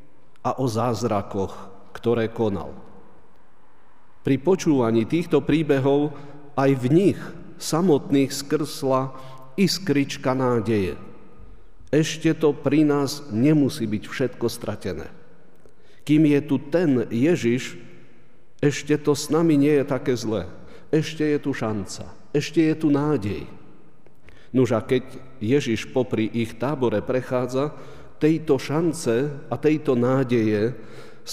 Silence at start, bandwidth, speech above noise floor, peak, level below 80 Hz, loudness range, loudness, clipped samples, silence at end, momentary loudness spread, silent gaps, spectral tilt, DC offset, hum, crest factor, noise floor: 0.45 s; 15.5 kHz; 36 dB; -6 dBFS; -54 dBFS; 3 LU; -23 LUFS; under 0.1%; 0 s; 12 LU; none; -6.5 dB/octave; 1%; none; 16 dB; -58 dBFS